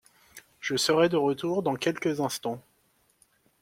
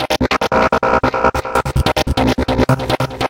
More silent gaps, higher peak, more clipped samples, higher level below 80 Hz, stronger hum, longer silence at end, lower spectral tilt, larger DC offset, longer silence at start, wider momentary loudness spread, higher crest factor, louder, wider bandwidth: neither; second, -10 dBFS vs 0 dBFS; neither; second, -68 dBFS vs -26 dBFS; neither; first, 1 s vs 0 s; second, -4 dB/octave vs -5.5 dB/octave; neither; first, 0.35 s vs 0 s; first, 13 LU vs 3 LU; about the same, 20 dB vs 16 dB; second, -27 LUFS vs -15 LUFS; about the same, 16.5 kHz vs 17 kHz